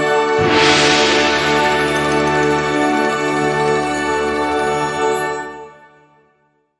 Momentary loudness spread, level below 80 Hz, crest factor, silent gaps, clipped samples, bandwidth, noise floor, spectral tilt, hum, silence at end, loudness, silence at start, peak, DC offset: 7 LU; -44 dBFS; 14 dB; none; under 0.1%; 11 kHz; -61 dBFS; -3.5 dB/octave; none; 1.05 s; -15 LUFS; 0 s; -2 dBFS; under 0.1%